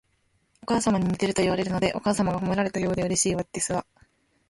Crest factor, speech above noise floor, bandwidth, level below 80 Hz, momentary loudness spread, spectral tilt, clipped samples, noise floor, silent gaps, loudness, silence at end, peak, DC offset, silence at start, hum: 16 dB; 44 dB; 11.5 kHz; -50 dBFS; 4 LU; -4.5 dB/octave; under 0.1%; -69 dBFS; none; -25 LUFS; 0.65 s; -10 dBFS; under 0.1%; 0.7 s; none